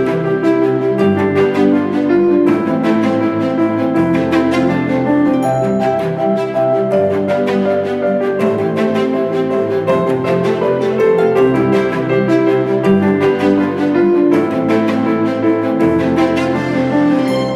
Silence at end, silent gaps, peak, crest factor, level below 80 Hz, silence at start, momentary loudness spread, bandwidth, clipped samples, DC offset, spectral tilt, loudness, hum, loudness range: 0 s; none; -2 dBFS; 12 dB; -50 dBFS; 0 s; 4 LU; 12.5 kHz; under 0.1%; under 0.1%; -7.5 dB/octave; -14 LUFS; none; 2 LU